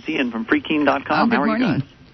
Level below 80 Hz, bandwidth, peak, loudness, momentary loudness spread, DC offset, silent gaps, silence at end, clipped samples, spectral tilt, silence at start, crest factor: -54 dBFS; 6.2 kHz; -4 dBFS; -19 LUFS; 5 LU; under 0.1%; none; 0.3 s; under 0.1%; -7.5 dB/octave; 0 s; 16 dB